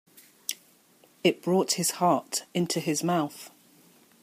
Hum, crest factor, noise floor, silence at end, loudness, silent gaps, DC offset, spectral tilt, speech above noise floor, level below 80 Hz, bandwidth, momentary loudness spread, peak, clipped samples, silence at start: none; 22 dB; -60 dBFS; 0.75 s; -27 LUFS; none; under 0.1%; -4 dB/octave; 34 dB; -76 dBFS; 15.5 kHz; 13 LU; -8 dBFS; under 0.1%; 0.5 s